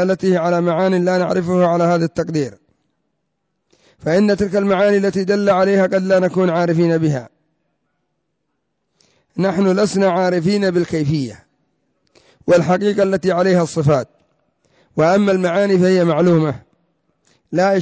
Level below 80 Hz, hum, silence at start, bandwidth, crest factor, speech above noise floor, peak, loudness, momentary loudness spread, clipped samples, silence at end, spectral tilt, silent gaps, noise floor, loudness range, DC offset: -52 dBFS; none; 0 s; 8 kHz; 12 dB; 57 dB; -4 dBFS; -16 LUFS; 8 LU; under 0.1%; 0 s; -7 dB/octave; none; -72 dBFS; 4 LU; under 0.1%